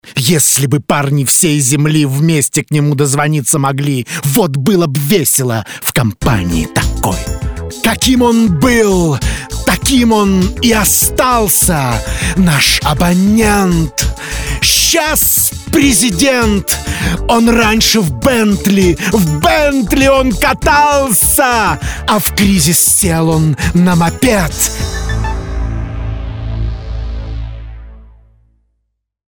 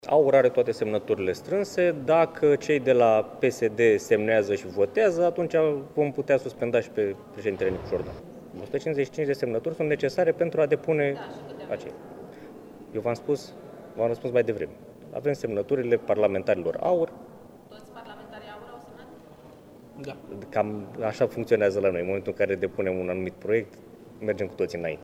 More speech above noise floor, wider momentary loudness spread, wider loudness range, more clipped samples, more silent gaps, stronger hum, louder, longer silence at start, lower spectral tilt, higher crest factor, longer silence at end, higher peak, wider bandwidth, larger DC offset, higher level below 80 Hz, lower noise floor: first, 57 dB vs 24 dB; second, 11 LU vs 21 LU; second, 5 LU vs 10 LU; neither; neither; neither; first, -11 LUFS vs -26 LUFS; about the same, 0.05 s vs 0.05 s; second, -4 dB/octave vs -6.5 dB/octave; second, 12 dB vs 18 dB; first, 1.3 s vs 0 s; first, 0 dBFS vs -8 dBFS; first, over 20 kHz vs 14.5 kHz; first, 0.3% vs under 0.1%; first, -24 dBFS vs -60 dBFS; first, -68 dBFS vs -49 dBFS